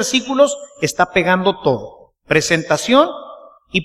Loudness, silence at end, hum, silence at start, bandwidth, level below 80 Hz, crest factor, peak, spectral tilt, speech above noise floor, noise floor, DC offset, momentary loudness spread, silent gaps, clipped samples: -16 LUFS; 0 s; none; 0 s; 15 kHz; -50 dBFS; 16 dB; 0 dBFS; -4 dB/octave; 24 dB; -39 dBFS; under 0.1%; 8 LU; none; under 0.1%